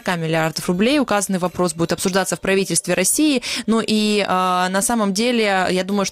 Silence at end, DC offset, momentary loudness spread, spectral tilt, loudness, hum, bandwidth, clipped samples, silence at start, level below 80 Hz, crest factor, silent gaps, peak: 0 s; under 0.1%; 4 LU; -3.5 dB/octave; -18 LUFS; none; 16 kHz; under 0.1%; 0.05 s; -52 dBFS; 16 dB; none; -2 dBFS